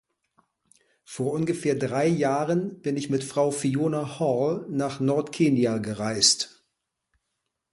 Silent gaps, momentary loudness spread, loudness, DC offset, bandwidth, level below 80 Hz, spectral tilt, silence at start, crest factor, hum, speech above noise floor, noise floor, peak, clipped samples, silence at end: none; 9 LU; -25 LUFS; under 0.1%; 11.5 kHz; -64 dBFS; -4.5 dB/octave; 1.1 s; 20 dB; none; 56 dB; -81 dBFS; -6 dBFS; under 0.1%; 1.25 s